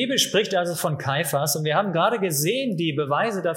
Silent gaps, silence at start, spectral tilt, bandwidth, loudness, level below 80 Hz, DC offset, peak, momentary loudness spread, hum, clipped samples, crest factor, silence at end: none; 0 s; -3.5 dB/octave; 17 kHz; -22 LUFS; -68 dBFS; under 0.1%; -6 dBFS; 4 LU; none; under 0.1%; 16 dB; 0 s